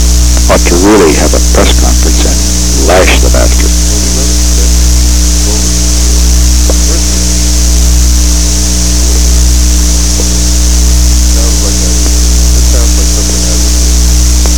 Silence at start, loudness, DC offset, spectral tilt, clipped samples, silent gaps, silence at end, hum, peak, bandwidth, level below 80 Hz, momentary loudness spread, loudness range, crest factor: 0 s; -7 LUFS; 10%; -3.5 dB/octave; under 0.1%; none; 0 s; 60 Hz at -5 dBFS; 0 dBFS; 18.5 kHz; -8 dBFS; 3 LU; 1 LU; 6 dB